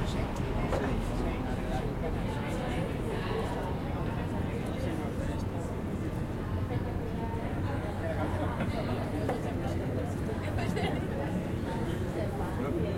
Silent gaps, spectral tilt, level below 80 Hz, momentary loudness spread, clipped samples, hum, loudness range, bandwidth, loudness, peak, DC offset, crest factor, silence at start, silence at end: none; -7 dB/octave; -40 dBFS; 3 LU; under 0.1%; none; 2 LU; 16.5 kHz; -33 LUFS; -16 dBFS; under 0.1%; 14 dB; 0 s; 0 s